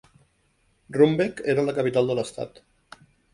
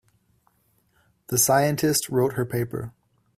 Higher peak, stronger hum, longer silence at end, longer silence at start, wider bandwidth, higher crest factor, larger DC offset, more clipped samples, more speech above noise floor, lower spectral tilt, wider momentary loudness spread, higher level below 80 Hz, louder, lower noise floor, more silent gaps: about the same, -4 dBFS vs -6 dBFS; neither; first, 0.85 s vs 0.45 s; second, 0.9 s vs 1.3 s; second, 11.5 kHz vs 16 kHz; about the same, 20 dB vs 20 dB; neither; neither; about the same, 44 dB vs 43 dB; first, -6.5 dB/octave vs -4 dB/octave; about the same, 13 LU vs 13 LU; about the same, -62 dBFS vs -58 dBFS; about the same, -23 LUFS vs -23 LUFS; about the same, -66 dBFS vs -66 dBFS; neither